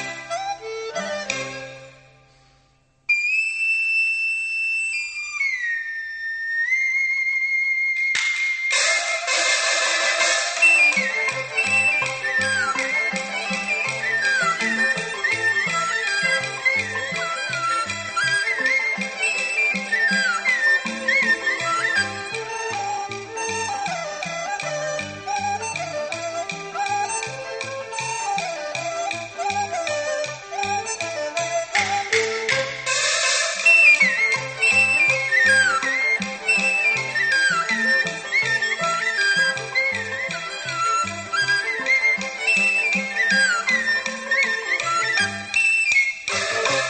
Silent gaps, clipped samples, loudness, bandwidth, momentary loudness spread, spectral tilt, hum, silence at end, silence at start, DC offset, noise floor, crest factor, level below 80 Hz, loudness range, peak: none; under 0.1%; -20 LUFS; 8.8 kHz; 11 LU; -1 dB/octave; none; 0 s; 0 s; under 0.1%; -60 dBFS; 18 dB; -64 dBFS; 9 LU; -4 dBFS